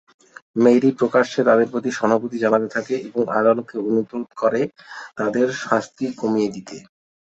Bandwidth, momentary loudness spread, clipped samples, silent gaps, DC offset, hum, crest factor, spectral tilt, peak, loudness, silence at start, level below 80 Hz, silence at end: 8 kHz; 12 LU; under 0.1%; none; under 0.1%; none; 18 dB; -6 dB/octave; -2 dBFS; -20 LUFS; 0.55 s; -64 dBFS; 0.4 s